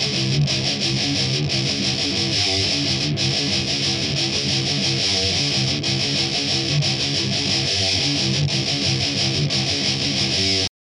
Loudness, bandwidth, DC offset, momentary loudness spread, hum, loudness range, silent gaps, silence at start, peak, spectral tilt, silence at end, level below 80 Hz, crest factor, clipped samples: -19 LUFS; 11 kHz; under 0.1%; 2 LU; none; 0 LU; none; 0 s; -6 dBFS; -3 dB/octave; 0.1 s; -46 dBFS; 14 dB; under 0.1%